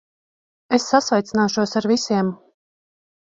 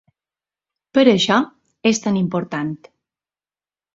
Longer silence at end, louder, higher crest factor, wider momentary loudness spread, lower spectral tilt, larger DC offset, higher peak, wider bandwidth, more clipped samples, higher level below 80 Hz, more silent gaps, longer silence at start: second, 0.9 s vs 1.2 s; about the same, -20 LUFS vs -18 LUFS; about the same, 20 dB vs 20 dB; second, 5 LU vs 14 LU; about the same, -4.5 dB/octave vs -5 dB/octave; neither; about the same, -2 dBFS vs -2 dBFS; about the same, 7.8 kHz vs 7.8 kHz; neither; about the same, -60 dBFS vs -62 dBFS; neither; second, 0.7 s vs 0.95 s